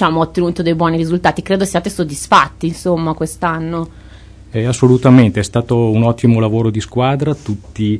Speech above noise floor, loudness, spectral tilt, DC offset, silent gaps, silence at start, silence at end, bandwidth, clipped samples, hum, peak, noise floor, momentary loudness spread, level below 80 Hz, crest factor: 23 dB; -14 LUFS; -6.5 dB/octave; under 0.1%; none; 0 s; 0 s; 11 kHz; 0.1%; none; 0 dBFS; -37 dBFS; 10 LU; -38 dBFS; 14 dB